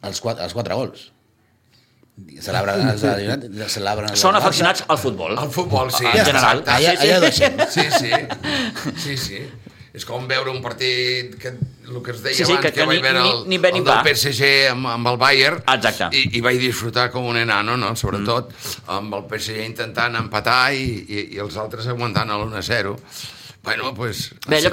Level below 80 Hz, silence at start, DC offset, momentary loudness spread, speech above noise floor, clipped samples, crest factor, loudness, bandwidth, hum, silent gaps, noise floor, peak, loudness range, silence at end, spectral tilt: -48 dBFS; 0.05 s; under 0.1%; 14 LU; 40 dB; under 0.1%; 20 dB; -18 LUFS; 16.5 kHz; none; none; -59 dBFS; 0 dBFS; 8 LU; 0 s; -3.5 dB/octave